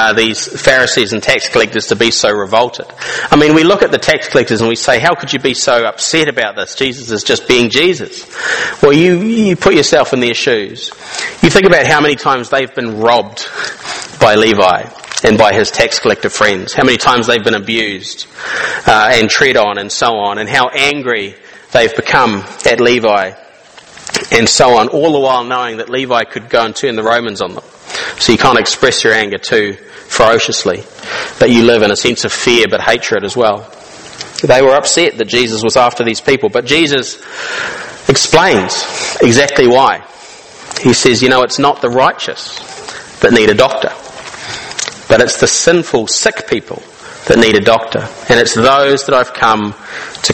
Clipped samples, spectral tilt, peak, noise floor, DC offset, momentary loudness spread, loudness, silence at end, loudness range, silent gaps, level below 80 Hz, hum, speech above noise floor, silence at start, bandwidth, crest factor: 0.8%; -3.5 dB/octave; 0 dBFS; -38 dBFS; under 0.1%; 13 LU; -10 LUFS; 0 s; 2 LU; none; -42 dBFS; none; 28 dB; 0 s; 14.5 kHz; 12 dB